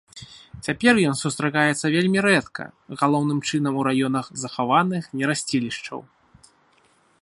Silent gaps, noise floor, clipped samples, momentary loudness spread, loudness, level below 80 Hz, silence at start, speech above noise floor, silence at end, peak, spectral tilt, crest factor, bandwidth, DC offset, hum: none; -60 dBFS; under 0.1%; 17 LU; -22 LUFS; -60 dBFS; 0.15 s; 38 dB; 1.2 s; -2 dBFS; -5 dB/octave; 22 dB; 11.5 kHz; under 0.1%; none